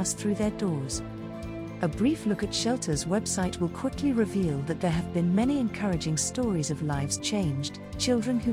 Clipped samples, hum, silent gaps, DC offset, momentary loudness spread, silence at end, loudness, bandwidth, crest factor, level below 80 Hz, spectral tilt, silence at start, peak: under 0.1%; none; none; under 0.1%; 7 LU; 0 s; -28 LUFS; 16 kHz; 14 dB; -48 dBFS; -5 dB/octave; 0 s; -14 dBFS